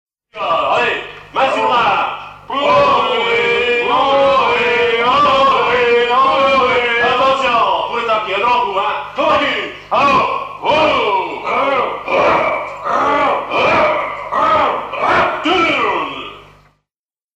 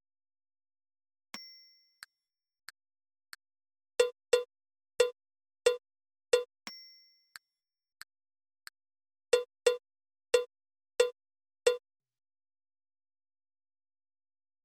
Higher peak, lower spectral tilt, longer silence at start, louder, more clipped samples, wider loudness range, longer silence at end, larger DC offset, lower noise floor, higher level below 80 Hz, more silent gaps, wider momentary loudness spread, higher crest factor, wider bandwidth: first, -2 dBFS vs -12 dBFS; first, -4 dB/octave vs 0.5 dB/octave; second, 0.35 s vs 1.35 s; first, -14 LUFS vs -32 LUFS; neither; second, 3 LU vs 7 LU; second, 0.95 s vs 2.85 s; neither; about the same, -88 dBFS vs under -90 dBFS; first, -48 dBFS vs -78 dBFS; neither; second, 7 LU vs 23 LU; second, 12 dB vs 26 dB; second, 9.6 kHz vs 17 kHz